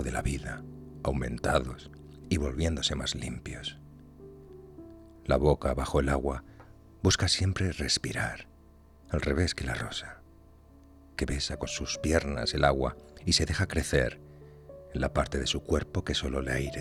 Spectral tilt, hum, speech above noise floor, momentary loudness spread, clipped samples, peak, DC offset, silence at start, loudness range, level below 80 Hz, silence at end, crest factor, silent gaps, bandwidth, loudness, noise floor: -4.5 dB/octave; none; 26 dB; 22 LU; under 0.1%; -10 dBFS; under 0.1%; 0 s; 5 LU; -40 dBFS; 0 s; 22 dB; none; 14.5 kHz; -30 LUFS; -56 dBFS